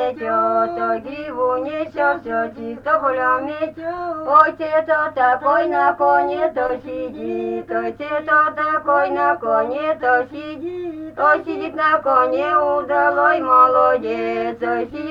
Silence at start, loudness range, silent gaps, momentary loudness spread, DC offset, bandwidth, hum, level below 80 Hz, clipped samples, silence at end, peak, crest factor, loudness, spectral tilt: 0 s; 4 LU; none; 11 LU; under 0.1%; 7 kHz; 50 Hz at -50 dBFS; -56 dBFS; under 0.1%; 0 s; 0 dBFS; 18 dB; -18 LUFS; -6.5 dB/octave